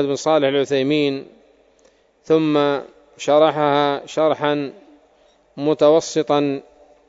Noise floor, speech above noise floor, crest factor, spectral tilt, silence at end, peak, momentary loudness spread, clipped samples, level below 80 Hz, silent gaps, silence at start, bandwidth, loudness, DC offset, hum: -56 dBFS; 39 dB; 18 dB; -5 dB/octave; 0.5 s; -2 dBFS; 10 LU; under 0.1%; -66 dBFS; none; 0 s; 8 kHz; -18 LUFS; under 0.1%; none